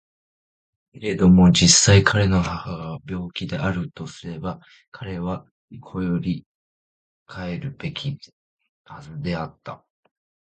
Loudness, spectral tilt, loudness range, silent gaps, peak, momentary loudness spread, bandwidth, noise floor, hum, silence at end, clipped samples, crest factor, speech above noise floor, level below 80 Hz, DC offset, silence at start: -20 LUFS; -4.5 dB/octave; 15 LU; 4.88-4.92 s, 5.51-5.68 s, 6.46-7.26 s, 8.33-8.57 s, 8.69-8.84 s; 0 dBFS; 22 LU; 9.2 kHz; under -90 dBFS; none; 0.8 s; under 0.1%; 22 dB; over 69 dB; -40 dBFS; under 0.1%; 0.95 s